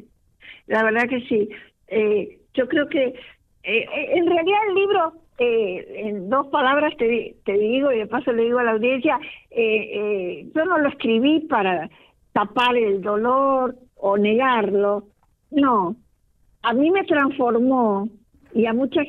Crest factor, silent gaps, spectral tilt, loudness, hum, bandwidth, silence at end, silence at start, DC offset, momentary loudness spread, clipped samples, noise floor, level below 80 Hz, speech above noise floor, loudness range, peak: 14 dB; none; -7 dB/octave; -21 LUFS; none; 5.6 kHz; 0 s; 0.45 s; under 0.1%; 8 LU; under 0.1%; -60 dBFS; -60 dBFS; 40 dB; 2 LU; -8 dBFS